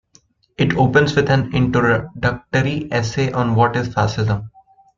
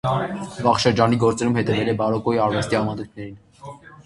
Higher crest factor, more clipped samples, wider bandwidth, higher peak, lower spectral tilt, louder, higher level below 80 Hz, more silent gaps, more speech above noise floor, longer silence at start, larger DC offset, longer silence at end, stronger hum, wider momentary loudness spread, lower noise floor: about the same, 16 dB vs 20 dB; neither; second, 7.6 kHz vs 11.5 kHz; about the same, -2 dBFS vs 0 dBFS; about the same, -6.5 dB/octave vs -6 dB/octave; about the same, -18 LUFS vs -20 LUFS; first, -42 dBFS vs -48 dBFS; neither; first, 39 dB vs 20 dB; first, 0.6 s vs 0.05 s; neither; first, 0.5 s vs 0.05 s; neither; second, 7 LU vs 21 LU; first, -56 dBFS vs -41 dBFS